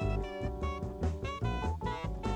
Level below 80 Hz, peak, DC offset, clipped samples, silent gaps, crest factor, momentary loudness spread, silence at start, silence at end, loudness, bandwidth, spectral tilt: -40 dBFS; -20 dBFS; under 0.1%; under 0.1%; none; 14 dB; 3 LU; 0 s; 0 s; -36 LUFS; 9.8 kHz; -7 dB/octave